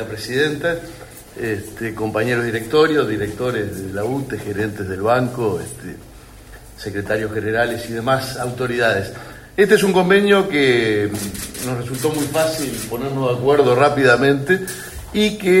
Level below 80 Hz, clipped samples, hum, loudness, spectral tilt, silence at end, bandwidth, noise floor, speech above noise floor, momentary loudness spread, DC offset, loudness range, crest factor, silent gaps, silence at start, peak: -46 dBFS; under 0.1%; none; -18 LUFS; -5 dB/octave; 0 s; 16.5 kHz; -40 dBFS; 22 dB; 14 LU; under 0.1%; 6 LU; 18 dB; none; 0 s; 0 dBFS